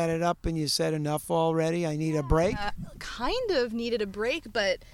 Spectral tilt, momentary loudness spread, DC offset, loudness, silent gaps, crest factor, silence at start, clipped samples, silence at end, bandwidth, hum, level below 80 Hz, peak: -5 dB/octave; 6 LU; under 0.1%; -28 LUFS; none; 18 dB; 0 s; under 0.1%; 0 s; 16.5 kHz; none; -42 dBFS; -10 dBFS